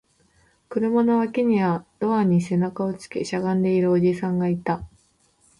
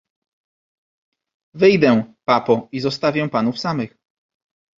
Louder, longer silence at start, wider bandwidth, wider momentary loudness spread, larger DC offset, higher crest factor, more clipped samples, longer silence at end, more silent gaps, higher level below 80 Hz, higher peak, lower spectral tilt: second, -22 LUFS vs -18 LUFS; second, 0.7 s vs 1.55 s; first, 11.5 kHz vs 7.6 kHz; about the same, 8 LU vs 10 LU; neither; second, 14 dB vs 20 dB; neither; second, 0.75 s vs 0.9 s; neither; about the same, -56 dBFS vs -58 dBFS; second, -10 dBFS vs 0 dBFS; first, -8 dB/octave vs -6.5 dB/octave